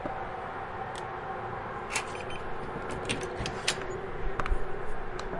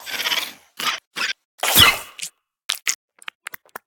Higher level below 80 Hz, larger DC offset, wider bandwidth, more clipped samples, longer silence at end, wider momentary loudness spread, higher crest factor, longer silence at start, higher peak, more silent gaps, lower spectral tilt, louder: first, -40 dBFS vs -50 dBFS; neither; second, 11.5 kHz vs 19 kHz; neither; second, 0 s vs 0.9 s; second, 6 LU vs 23 LU; about the same, 22 dB vs 22 dB; about the same, 0 s vs 0 s; second, -10 dBFS vs 0 dBFS; second, none vs 1.07-1.11 s, 1.45-1.58 s, 2.65-2.69 s; first, -3.5 dB/octave vs -0.5 dB/octave; second, -35 LUFS vs -18 LUFS